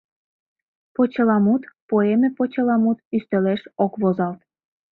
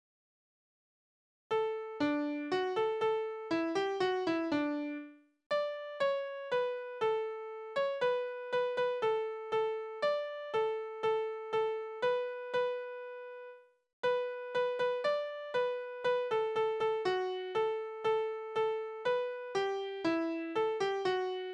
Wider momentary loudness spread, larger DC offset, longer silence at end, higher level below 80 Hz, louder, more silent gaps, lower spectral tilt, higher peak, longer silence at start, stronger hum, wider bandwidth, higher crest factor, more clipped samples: about the same, 7 LU vs 5 LU; neither; first, 0.6 s vs 0 s; first, -66 dBFS vs -78 dBFS; first, -21 LUFS vs -35 LUFS; about the same, 1.82-1.89 s, 3.05-3.11 s vs 5.46-5.50 s, 13.93-14.03 s; first, -11 dB/octave vs -5 dB/octave; first, -6 dBFS vs -20 dBFS; second, 1 s vs 1.5 s; neither; second, 4.2 kHz vs 9.2 kHz; about the same, 16 dB vs 14 dB; neither